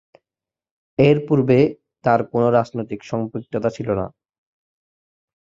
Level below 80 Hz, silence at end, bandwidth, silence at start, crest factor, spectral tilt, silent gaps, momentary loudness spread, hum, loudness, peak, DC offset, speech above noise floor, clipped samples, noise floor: -52 dBFS; 1.5 s; 7.6 kHz; 1 s; 20 dB; -8.5 dB/octave; none; 11 LU; none; -20 LUFS; -2 dBFS; under 0.1%; over 72 dB; under 0.1%; under -90 dBFS